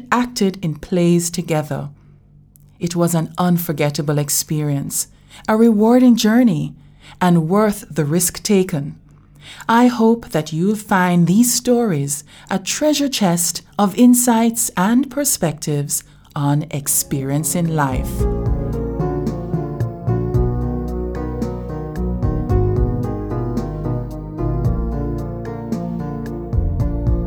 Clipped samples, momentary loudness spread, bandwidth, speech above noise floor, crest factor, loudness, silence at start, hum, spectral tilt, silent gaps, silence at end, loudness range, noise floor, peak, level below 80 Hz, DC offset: under 0.1%; 12 LU; over 20 kHz; 31 dB; 18 dB; -18 LUFS; 0 s; none; -5 dB/octave; none; 0 s; 7 LU; -47 dBFS; 0 dBFS; -30 dBFS; under 0.1%